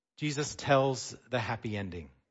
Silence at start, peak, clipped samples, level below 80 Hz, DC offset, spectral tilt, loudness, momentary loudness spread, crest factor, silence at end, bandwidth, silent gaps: 0.2 s; -12 dBFS; under 0.1%; -62 dBFS; under 0.1%; -5 dB/octave; -32 LUFS; 11 LU; 20 dB; 0.25 s; 8 kHz; none